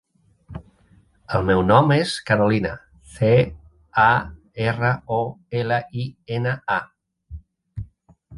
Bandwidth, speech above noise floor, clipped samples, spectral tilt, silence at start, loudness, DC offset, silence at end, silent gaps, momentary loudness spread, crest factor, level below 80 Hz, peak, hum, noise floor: 11.5 kHz; 36 dB; under 0.1%; -6.5 dB/octave; 0.5 s; -21 LUFS; under 0.1%; 0 s; none; 22 LU; 22 dB; -44 dBFS; 0 dBFS; none; -56 dBFS